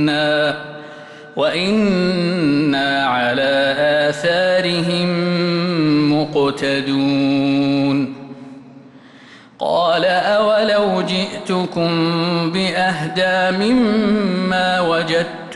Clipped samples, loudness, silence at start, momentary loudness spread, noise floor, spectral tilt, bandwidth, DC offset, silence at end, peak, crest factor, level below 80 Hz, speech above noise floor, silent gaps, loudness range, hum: under 0.1%; -17 LUFS; 0 s; 6 LU; -42 dBFS; -6 dB/octave; 11.5 kHz; under 0.1%; 0 s; -6 dBFS; 10 dB; -54 dBFS; 26 dB; none; 3 LU; none